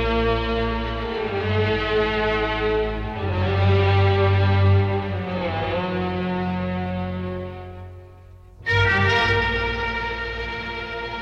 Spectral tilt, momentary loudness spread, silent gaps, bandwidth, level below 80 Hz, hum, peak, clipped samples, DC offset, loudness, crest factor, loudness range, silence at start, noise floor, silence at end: -7 dB/octave; 11 LU; none; 6.6 kHz; -36 dBFS; none; -8 dBFS; under 0.1%; under 0.1%; -22 LUFS; 14 dB; 6 LU; 0 s; -44 dBFS; 0 s